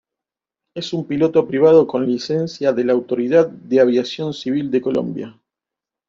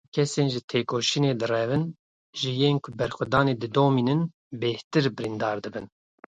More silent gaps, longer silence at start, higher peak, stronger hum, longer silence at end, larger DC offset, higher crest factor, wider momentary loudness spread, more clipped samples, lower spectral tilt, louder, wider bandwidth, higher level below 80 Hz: second, none vs 0.64-0.68 s, 1.99-2.33 s, 4.34-4.51 s, 4.84-4.91 s; first, 0.75 s vs 0.15 s; first, -2 dBFS vs -6 dBFS; neither; first, 0.8 s vs 0.45 s; neither; about the same, 16 dB vs 20 dB; first, 13 LU vs 9 LU; neither; first, -7 dB/octave vs -5.5 dB/octave; first, -18 LUFS vs -26 LUFS; second, 7.4 kHz vs 9.4 kHz; about the same, -60 dBFS vs -60 dBFS